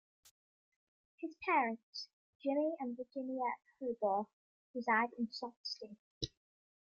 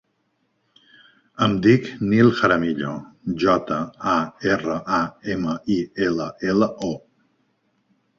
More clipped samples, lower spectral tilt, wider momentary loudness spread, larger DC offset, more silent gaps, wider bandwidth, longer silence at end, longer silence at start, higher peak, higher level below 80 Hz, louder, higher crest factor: neither; second, -4.5 dB/octave vs -6.5 dB/octave; first, 15 LU vs 12 LU; neither; first, 1.83-1.93 s, 2.13-2.40 s, 4.33-4.74 s, 5.56-5.64 s, 5.99-6.21 s vs none; first, 8.2 kHz vs 7.4 kHz; second, 0.55 s vs 1.2 s; second, 1.2 s vs 1.4 s; second, -20 dBFS vs -2 dBFS; second, -72 dBFS vs -54 dBFS; second, -39 LUFS vs -21 LUFS; about the same, 20 dB vs 20 dB